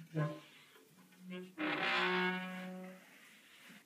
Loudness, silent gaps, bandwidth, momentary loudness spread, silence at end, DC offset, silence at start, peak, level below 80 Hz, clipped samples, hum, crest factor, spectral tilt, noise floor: -38 LUFS; none; 15.5 kHz; 25 LU; 0.05 s; under 0.1%; 0 s; -20 dBFS; under -90 dBFS; under 0.1%; none; 20 dB; -5.5 dB/octave; -63 dBFS